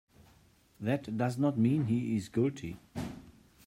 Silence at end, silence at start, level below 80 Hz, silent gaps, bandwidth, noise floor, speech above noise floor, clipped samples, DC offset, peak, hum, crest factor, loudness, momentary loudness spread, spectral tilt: 0.35 s; 0.8 s; -64 dBFS; none; 15.5 kHz; -64 dBFS; 33 dB; under 0.1%; under 0.1%; -18 dBFS; none; 16 dB; -32 LUFS; 14 LU; -8 dB/octave